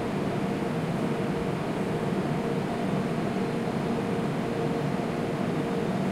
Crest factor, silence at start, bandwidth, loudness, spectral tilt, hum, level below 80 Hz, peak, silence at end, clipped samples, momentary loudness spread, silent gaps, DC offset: 12 dB; 0 s; 16 kHz; -29 LUFS; -7 dB/octave; none; -54 dBFS; -16 dBFS; 0 s; under 0.1%; 1 LU; none; under 0.1%